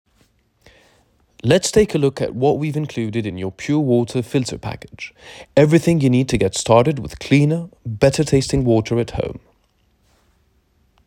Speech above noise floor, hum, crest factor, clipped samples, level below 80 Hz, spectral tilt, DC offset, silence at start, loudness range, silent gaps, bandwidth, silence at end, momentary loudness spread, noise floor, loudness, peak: 44 dB; none; 18 dB; under 0.1%; -42 dBFS; -6 dB/octave; under 0.1%; 1.45 s; 4 LU; none; 16 kHz; 1.7 s; 15 LU; -61 dBFS; -18 LUFS; 0 dBFS